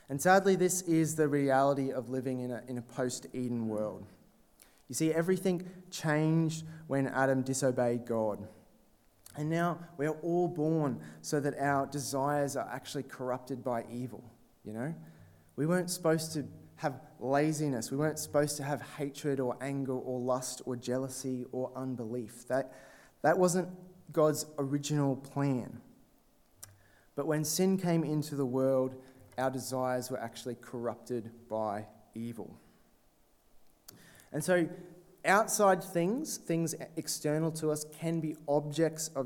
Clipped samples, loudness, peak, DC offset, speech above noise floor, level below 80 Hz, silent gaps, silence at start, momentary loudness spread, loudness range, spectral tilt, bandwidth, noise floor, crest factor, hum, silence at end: under 0.1%; -33 LUFS; -10 dBFS; under 0.1%; 35 dB; -72 dBFS; none; 0.1 s; 13 LU; 6 LU; -5.5 dB/octave; 18.5 kHz; -67 dBFS; 22 dB; none; 0 s